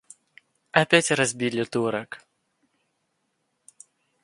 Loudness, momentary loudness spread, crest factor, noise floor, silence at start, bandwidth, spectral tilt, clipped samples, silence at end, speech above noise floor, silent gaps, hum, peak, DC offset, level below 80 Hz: -23 LUFS; 16 LU; 24 dB; -75 dBFS; 0.75 s; 11.5 kHz; -3.5 dB/octave; under 0.1%; 2.05 s; 51 dB; none; none; -2 dBFS; under 0.1%; -66 dBFS